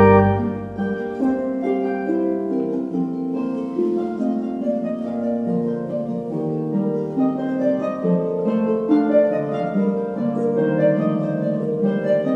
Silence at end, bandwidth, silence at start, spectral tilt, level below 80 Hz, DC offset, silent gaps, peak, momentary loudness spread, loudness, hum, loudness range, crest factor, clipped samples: 0 s; 6.8 kHz; 0 s; -10 dB/octave; -52 dBFS; under 0.1%; none; 0 dBFS; 7 LU; -21 LUFS; none; 4 LU; 20 dB; under 0.1%